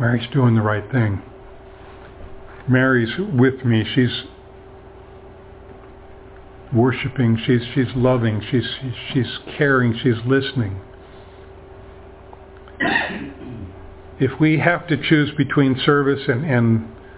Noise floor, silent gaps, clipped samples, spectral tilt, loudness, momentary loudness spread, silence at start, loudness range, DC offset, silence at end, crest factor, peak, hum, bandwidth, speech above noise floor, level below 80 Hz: -41 dBFS; none; under 0.1%; -11 dB/octave; -19 LUFS; 17 LU; 0 s; 7 LU; under 0.1%; 0 s; 20 dB; 0 dBFS; none; 4 kHz; 23 dB; -44 dBFS